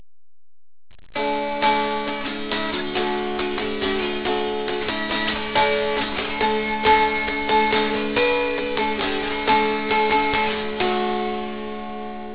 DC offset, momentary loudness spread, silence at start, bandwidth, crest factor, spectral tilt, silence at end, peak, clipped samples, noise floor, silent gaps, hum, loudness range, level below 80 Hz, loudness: 1%; 8 LU; 1.05 s; 4 kHz; 16 dB; -7.5 dB/octave; 0 s; -6 dBFS; under 0.1%; under -90 dBFS; none; none; 4 LU; -46 dBFS; -22 LUFS